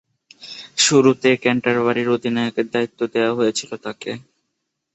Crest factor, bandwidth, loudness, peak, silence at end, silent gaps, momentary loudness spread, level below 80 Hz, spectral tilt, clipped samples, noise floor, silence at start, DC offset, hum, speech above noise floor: 18 dB; 8.4 kHz; -18 LUFS; -2 dBFS; 0.75 s; none; 16 LU; -62 dBFS; -3.5 dB/octave; under 0.1%; -76 dBFS; 0.4 s; under 0.1%; none; 57 dB